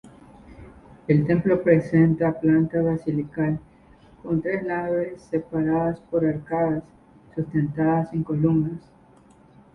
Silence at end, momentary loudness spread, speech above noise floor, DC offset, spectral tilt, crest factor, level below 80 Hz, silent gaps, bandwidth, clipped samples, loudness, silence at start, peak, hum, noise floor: 0.95 s; 11 LU; 31 dB; under 0.1%; -10.5 dB/octave; 18 dB; -52 dBFS; none; 5.8 kHz; under 0.1%; -23 LUFS; 0.5 s; -6 dBFS; none; -53 dBFS